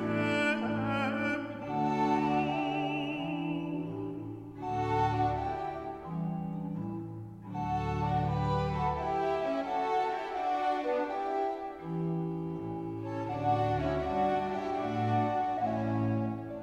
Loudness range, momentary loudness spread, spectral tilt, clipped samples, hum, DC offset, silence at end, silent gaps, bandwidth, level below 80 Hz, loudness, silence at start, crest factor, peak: 3 LU; 9 LU; -7.5 dB/octave; under 0.1%; none; under 0.1%; 0 s; none; 10 kHz; -52 dBFS; -32 LUFS; 0 s; 14 dB; -18 dBFS